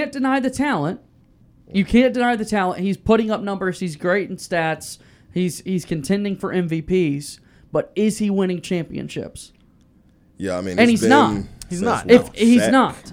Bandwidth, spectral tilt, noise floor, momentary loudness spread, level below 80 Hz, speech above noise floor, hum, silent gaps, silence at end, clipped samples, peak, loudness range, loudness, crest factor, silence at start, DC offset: 15.5 kHz; -5.5 dB/octave; -54 dBFS; 15 LU; -46 dBFS; 35 dB; none; none; 0 s; under 0.1%; 0 dBFS; 6 LU; -19 LUFS; 20 dB; 0 s; under 0.1%